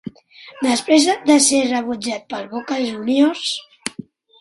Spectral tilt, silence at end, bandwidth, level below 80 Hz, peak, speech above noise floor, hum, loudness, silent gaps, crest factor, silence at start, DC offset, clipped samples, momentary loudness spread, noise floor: -2 dB/octave; 0.5 s; 11.5 kHz; -64 dBFS; 0 dBFS; 20 dB; none; -18 LUFS; none; 18 dB; 0.05 s; under 0.1%; under 0.1%; 17 LU; -38 dBFS